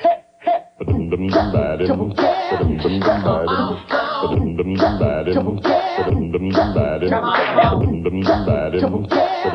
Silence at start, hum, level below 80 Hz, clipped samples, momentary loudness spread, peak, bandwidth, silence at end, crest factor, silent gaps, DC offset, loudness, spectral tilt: 0 s; none; -34 dBFS; under 0.1%; 4 LU; -2 dBFS; 6.4 kHz; 0 s; 16 dB; none; under 0.1%; -18 LUFS; -8.5 dB/octave